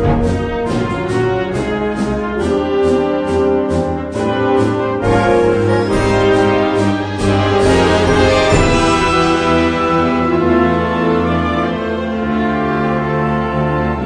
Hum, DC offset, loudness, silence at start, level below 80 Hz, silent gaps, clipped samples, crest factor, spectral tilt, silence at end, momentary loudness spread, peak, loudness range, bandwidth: none; under 0.1%; -14 LUFS; 0 s; -28 dBFS; none; under 0.1%; 14 dB; -6 dB/octave; 0 s; 6 LU; 0 dBFS; 4 LU; 10.5 kHz